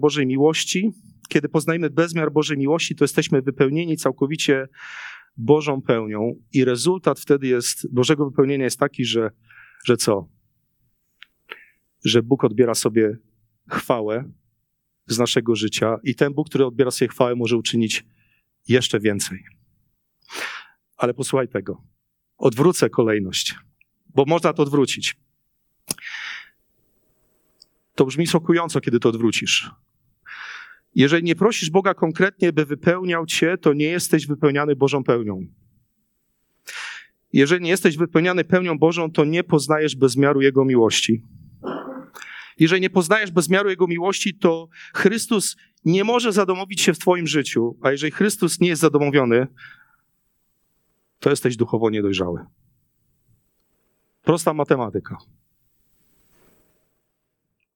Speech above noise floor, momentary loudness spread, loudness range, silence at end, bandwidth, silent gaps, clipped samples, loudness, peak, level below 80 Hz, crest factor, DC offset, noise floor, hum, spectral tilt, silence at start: 56 dB; 14 LU; 6 LU; 2.6 s; 19 kHz; none; under 0.1%; -20 LUFS; -2 dBFS; -64 dBFS; 20 dB; under 0.1%; -75 dBFS; none; -4.5 dB/octave; 0 s